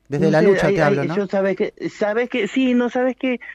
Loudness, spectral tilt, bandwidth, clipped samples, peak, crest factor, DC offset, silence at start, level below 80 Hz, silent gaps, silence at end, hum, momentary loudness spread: -19 LUFS; -7 dB/octave; 9.8 kHz; under 0.1%; -4 dBFS; 14 dB; under 0.1%; 0.1 s; -52 dBFS; none; 0 s; none; 8 LU